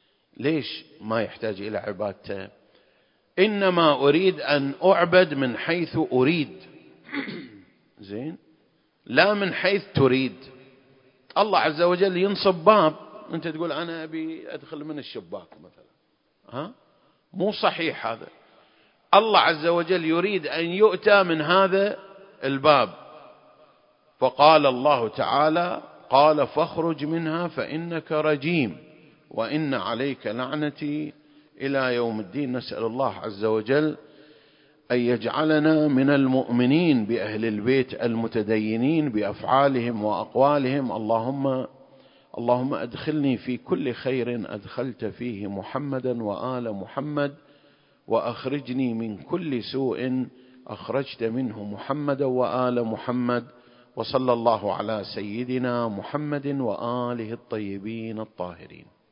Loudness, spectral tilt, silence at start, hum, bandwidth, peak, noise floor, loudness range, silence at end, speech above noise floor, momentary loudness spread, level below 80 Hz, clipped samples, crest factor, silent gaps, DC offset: -24 LUFS; -10.5 dB/octave; 0.4 s; none; 5.4 kHz; 0 dBFS; -69 dBFS; 9 LU; 0.35 s; 45 dB; 15 LU; -64 dBFS; under 0.1%; 24 dB; none; under 0.1%